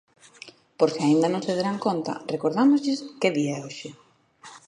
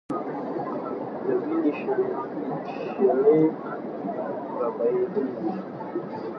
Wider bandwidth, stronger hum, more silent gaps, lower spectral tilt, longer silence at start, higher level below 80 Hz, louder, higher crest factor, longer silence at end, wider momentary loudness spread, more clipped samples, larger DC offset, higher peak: first, 10.5 kHz vs 5.8 kHz; neither; neither; second, -5.5 dB/octave vs -9.5 dB/octave; first, 0.45 s vs 0.1 s; about the same, -74 dBFS vs -72 dBFS; first, -24 LUFS vs -27 LUFS; about the same, 18 dB vs 18 dB; about the same, 0.1 s vs 0 s; first, 22 LU vs 12 LU; neither; neither; about the same, -6 dBFS vs -8 dBFS